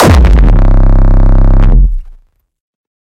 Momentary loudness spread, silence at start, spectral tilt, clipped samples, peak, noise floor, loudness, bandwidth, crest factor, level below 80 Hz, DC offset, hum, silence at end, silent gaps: 6 LU; 0 s; -7 dB/octave; 0.1%; 0 dBFS; -40 dBFS; -9 LUFS; 9.8 kHz; 6 dB; -6 dBFS; under 0.1%; none; 0.9 s; none